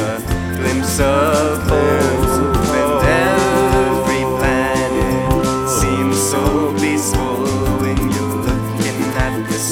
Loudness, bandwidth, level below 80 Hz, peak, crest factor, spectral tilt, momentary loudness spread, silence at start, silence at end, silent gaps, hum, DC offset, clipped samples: -16 LUFS; over 20 kHz; -28 dBFS; 0 dBFS; 14 dB; -5 dB/octave; 5 LU; 0 s; 0 s; none; none; under 0.1%; under 0.1%